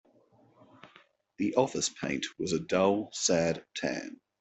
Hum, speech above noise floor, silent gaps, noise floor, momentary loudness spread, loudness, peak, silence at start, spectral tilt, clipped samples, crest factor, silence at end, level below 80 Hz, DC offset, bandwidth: none; 34 dB; none; -64 dBFS; 8 LU; -30 LUFS; -12 dBFS; 0.85 s; -3.5 dB/octave; under 0.1%; 20 dB; 0.25 s; -66 dBFS; under 0.1%; 8.4 kHz